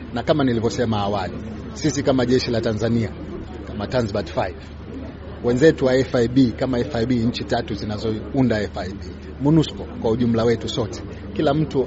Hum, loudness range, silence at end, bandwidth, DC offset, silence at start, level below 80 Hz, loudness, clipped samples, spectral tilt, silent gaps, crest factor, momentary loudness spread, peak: none; 3 LU; 0 s; 8 kHz; under 0.1%; 0 s; -38 dBFS; -21 LUFS; under 0.1%; -6 dB/octave; none; 20 dB; 14 LU; -2 dBFS